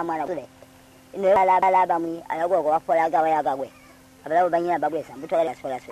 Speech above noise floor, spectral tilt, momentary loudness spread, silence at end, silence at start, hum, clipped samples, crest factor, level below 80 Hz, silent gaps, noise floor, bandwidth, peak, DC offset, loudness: 28 dB; -6 dB/octave; 14 LU; 0 s; 0 s; none; under 0.1%; 14 dB; -64 dBFS; none; -50 dBFS; 14 kHz; -8 dBFS; under 0.1%; -22 LUFS